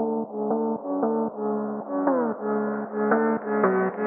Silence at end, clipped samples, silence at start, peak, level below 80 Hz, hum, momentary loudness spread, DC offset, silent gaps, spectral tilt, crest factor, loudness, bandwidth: 0 s; under 0.1%; 0 s; -8 dBFS; -82 dBFS; none; 6 LU; under 0.1%; none; -3 dB/octave; 18 dB; -25 LUFS; 2.8 kHz